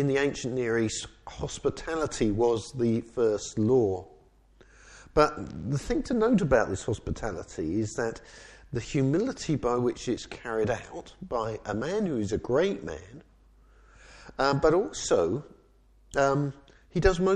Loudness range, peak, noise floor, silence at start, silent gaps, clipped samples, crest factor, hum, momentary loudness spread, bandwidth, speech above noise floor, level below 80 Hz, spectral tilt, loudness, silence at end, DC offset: 3 LU; -6 dBFS; -60 dBFS; 0 s; none; under 0.1%; 22 dB; none; 12 LU; 11 kHz; 32 dB; -46 dBFS; -6 dB/octave; -28 LUFS; 0 s; under 0.1%